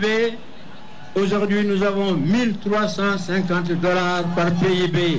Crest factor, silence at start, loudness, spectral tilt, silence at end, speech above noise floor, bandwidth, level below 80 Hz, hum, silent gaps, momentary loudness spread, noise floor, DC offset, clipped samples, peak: 10 dB; 0 s; -20 LUFS; -6 dB/octave; 0 s; 22 dB; 8 kHz; -52 dBFS; none; none; 3 LU; -42 dBFS; 2%; under 0.1%; -10 dBFS